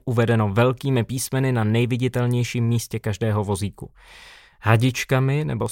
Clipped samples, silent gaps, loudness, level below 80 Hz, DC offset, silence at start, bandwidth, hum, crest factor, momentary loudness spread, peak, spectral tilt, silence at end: under 0.1%; none; -22 LUFS; -50 dBFS; under 0.1%; 0.05 s; 16.5 kHz; none; 18 dB; 8 LU; -4 dBFS; -6 dB/octave; 0 s